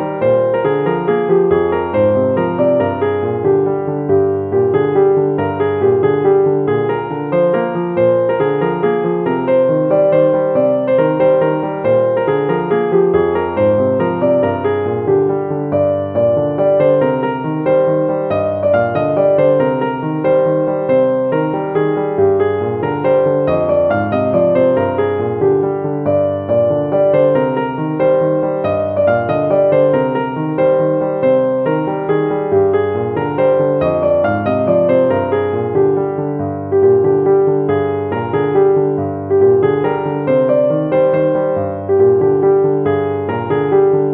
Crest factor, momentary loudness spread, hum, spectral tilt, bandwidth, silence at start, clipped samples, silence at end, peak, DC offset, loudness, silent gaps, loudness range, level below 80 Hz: 12 dB; 5 LU; none; -7.5 dB/octave; 4 kHz; 0 s; under 0.1%; 0 s; -2 dBFS; under 0.1%; -14 LUFS; none; 1 LU; -50 dBFS